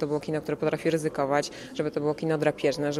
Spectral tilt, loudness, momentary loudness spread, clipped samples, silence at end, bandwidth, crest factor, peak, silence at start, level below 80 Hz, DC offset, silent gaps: -5.5 dB/octave; -28 LUFS; 5 LU; under 0.1%; 0 s; 13.5 kHz; 18 dB; -10 dBFS; 0 s; -62 dBFS; under 0.1%; none